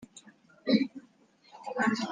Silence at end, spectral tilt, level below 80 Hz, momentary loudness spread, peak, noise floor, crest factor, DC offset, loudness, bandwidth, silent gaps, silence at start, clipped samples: 0 s; -5 dB/octave; -76 dBFS; 22 LU; -12 dBFS; -62 dBFS; 20 dB; under 0.1%; -30 LUFS; 9.4 kHz; none; 0 s; under 0.1%